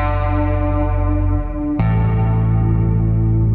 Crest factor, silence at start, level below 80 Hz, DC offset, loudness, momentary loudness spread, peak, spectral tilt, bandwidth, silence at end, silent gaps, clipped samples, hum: 10 dB; 0 s; -22 dBFS; under 0.1%; -18 LUFS; 3 LU; -6 dBFS; -12 dB/octave; 3.9 kHz; 0 s; none; under 0.1%; none